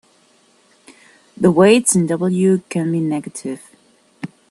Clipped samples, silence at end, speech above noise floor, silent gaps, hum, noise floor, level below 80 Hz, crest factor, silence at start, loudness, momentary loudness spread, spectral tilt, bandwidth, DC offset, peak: under 0.1%; 0.25 s; 39 dB; none; none; -55 dBFS; -60 dBFS; 18 dB; 1.4 s; -16 LUFS; 22 LU; -5.5 dB/octave; 12.5 kHz; under 0.1%; 0 dBFS